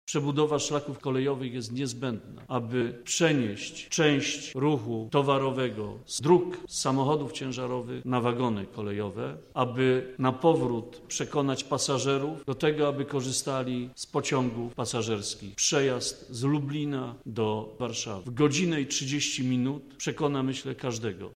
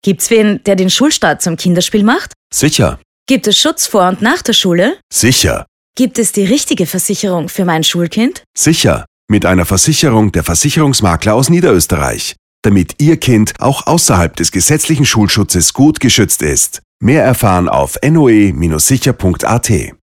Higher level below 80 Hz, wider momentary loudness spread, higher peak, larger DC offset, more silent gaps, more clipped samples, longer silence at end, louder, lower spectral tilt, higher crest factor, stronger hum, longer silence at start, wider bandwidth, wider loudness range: second, -62 dBFS vs -34 dBFS; first, 9 LU vs 6 LU; second, -8 dBFS vs 0 dBFS; neither; second, none vs 2.36-2.50 s, 3.05-3.26 s, 5.03-5.10 s, 5.68-5.94 s, 8.46-8.54 s, 9.07-9.28 s, 12.39-12.63 s, 16.84-17.00 s; neither; second, 0 s vs 0.15 s; second, -29 LUFS vs -10 LUFS; about the same, -4.5 dB/octave vs -4 dB/octave; first, 20 dB vs 10 dB; neither; about the same, 0.05 s vs 0.05 s; second, 15.5 kHz vs 17.5 kHz; about the same, 2 LU vs 2 LU